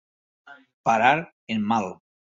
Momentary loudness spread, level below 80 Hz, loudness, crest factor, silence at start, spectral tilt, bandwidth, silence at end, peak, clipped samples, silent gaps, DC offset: 11 LU; -66 dBFS; -23 LUFS; 20 dB; 0.45 s; -5 dB/octave; 7.6 kHz; 0.4 s; -6 dBFS; under 0.1%; 0.74-0.84 s, 1.32-1.47 s; under 0.1%